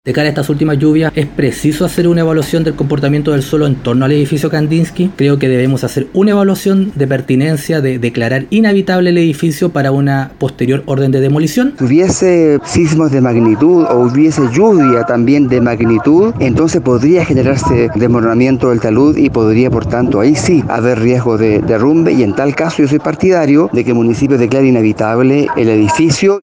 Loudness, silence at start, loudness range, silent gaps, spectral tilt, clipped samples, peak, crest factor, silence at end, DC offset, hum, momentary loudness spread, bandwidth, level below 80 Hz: -11 LUFS; 0.05 s; 3 LU; none; -7 dB/octave; under 0.1%; 0 dBFS; 10 dB; 0 s; under 0.1%; none; 4 LU; 17 kHz; -38 dBFS